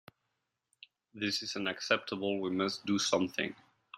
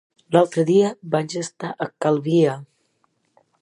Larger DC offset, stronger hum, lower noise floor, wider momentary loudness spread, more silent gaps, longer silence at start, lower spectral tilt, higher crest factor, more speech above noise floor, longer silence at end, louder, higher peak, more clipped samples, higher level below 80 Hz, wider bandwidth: neither; neither; first, -84 dBFS vs -67 dBFS; second, 7 LU vs 11 LU; neither; first, 1.15 s vs 0.3 s; second, -3.5 dB/octave vs -6.5 dB/octave; about the same, 24 dB vs 20 dB; about the same, 51 dB vs 48 dB; second, 0 s vs 0.95 s; second, -33 LUFS vs -21 LUFS; second, -12 dBFS vs -2 dBFS; neither; second, -78 dBFS vs -72 dBFS; first, 14 kHz vs 11.5 kHz